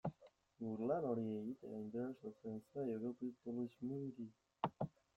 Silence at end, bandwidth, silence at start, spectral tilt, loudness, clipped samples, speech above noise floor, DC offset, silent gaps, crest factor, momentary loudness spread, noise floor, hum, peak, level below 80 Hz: 0.25 s; 7.4 kHz; 0.05 s; -9.5 dB/octave; -46 LUFS; under 0.1%; 24 dB; under 0.1%; none; 22 dB; 10 LU; -69 dBFS; none; -24 dBFS; -80 dBFS